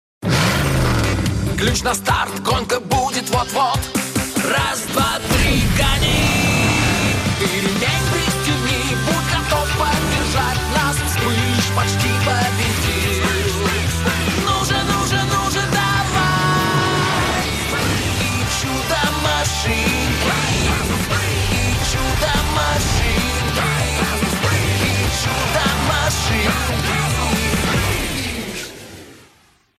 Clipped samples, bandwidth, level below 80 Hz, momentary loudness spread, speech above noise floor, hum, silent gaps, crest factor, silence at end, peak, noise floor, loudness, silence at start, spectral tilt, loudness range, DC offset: under 0.1%; 15.5 kHz; -28 dBFS; 3 LU; 36 dB; none; none; 14 dB; 0.6 s; -4 dBFS; -54 dBFS; -17 LUFS; 0.2 s; -4 dB/octave; 2 LU; under 0.1%